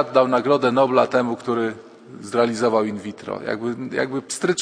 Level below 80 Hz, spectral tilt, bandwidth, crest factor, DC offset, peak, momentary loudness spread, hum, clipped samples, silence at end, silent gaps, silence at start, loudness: -66 dBFS; -5 dB/octave; 11 kHz; 20 dB; under 0.1%; 0 dBFS; 12 LU; none; under 0.1%; 0 s; none; 0 s; -21 LUFS